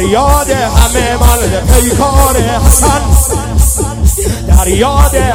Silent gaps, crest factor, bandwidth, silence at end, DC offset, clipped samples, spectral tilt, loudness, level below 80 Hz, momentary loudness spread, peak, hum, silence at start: none; 8 dB; over 20 kHz; 0 s; under 0.1%; 4%; -4.5 dB/octave; -9 LUFS; -10 dBFS; 4 LU; 0 dBFS; none; 0 s